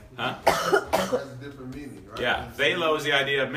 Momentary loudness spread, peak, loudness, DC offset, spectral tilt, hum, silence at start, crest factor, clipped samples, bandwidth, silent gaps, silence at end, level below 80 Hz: 17 LU; -4 dBFS; -24 LUFS; under 0.1%; -3.5 dB/octave; none; 0 s; 22 dB; under 0.1%; 15.5 kHz; none; 0 s; -52 dBFS